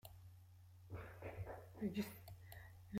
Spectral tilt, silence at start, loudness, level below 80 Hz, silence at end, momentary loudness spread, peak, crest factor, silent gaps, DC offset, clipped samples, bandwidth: -6.5 dB/octave; 0.05 s; -51 LUFS; -68 dBFS; 0 s; 19 LU; -32 dBFS; 18 dB; none; under 0.1%; under 0.1%; 16 kHz